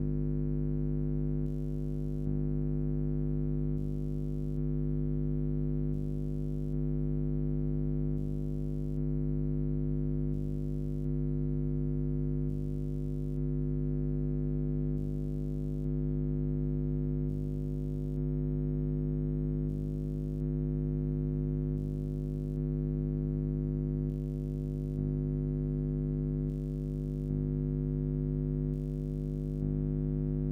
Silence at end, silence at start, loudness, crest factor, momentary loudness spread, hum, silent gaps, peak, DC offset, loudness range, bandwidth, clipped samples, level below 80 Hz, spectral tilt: 0 s; 0 s; -34 LUFS; 12 dB; 3 LU; 50 Hz at -35 dBFS; none; -20 dBFS; under 0.1%; 1 LU; 2.2 kHz; under 0.1%; -38 dBFS; -12 dB/octave